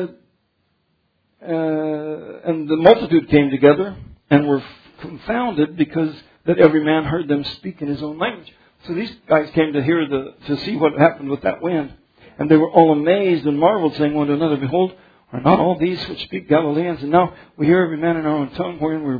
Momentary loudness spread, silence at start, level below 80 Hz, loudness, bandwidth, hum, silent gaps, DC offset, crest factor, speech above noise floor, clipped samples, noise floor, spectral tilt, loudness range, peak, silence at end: 13 LU; 0 s; -50 dBFS; -18 LUFS; 5 kHz; none; none; under 0.1%; 18 dB; 50 dB; under 0.1%; -67 dBFS; -9.5 dB/octave; 3 LU; 0 dBFS; 0 s